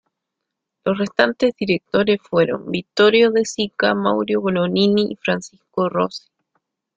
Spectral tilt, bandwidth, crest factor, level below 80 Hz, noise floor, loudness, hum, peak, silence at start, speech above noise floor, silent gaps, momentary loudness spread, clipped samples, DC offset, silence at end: -5.5 dB/octave; 9.2 kHz; 18 dB; -58 dBFS; -81 dBFS; -19 LUFS; none; 0 dBFS; 0.85 s; 62 dB; none; 9 LU; under 0.1%; under 0.1%; 0.8 s